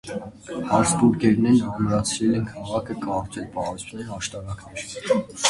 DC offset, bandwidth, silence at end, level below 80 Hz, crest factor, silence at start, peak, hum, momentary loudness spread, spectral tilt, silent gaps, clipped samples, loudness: under 0.1%; 11.5 kHz; 0 s; -48 dBFS; 20 dB; 0.05 s; -4 dBFS; none; 15 LU; -5 dB/octave; none; under 0.1%; -23 LUFS